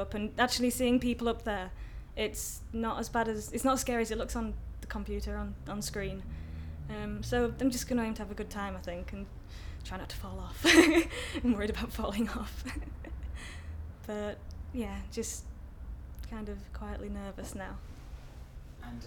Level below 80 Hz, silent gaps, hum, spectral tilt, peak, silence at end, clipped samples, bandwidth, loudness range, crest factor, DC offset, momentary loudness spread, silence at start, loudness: -44 dBFS; none; none; -4 dB/octave; -8 dBFS; 0 s; under 0.1%; 19 kHz; 12 LU; 26 dB; under 0.1%; 17 LU; 0 s; -33 LUFS